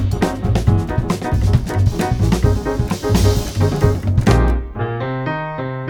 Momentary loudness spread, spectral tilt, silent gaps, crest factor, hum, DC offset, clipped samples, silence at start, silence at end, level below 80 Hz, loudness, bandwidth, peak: 7 LU; -6.5 dB/octave; none; 16 dB; none; under 0.1%; under 0.1%; 0 s; 0 s; -22 dBFS; -18 LUFS; 19 kHz; 0 dBFS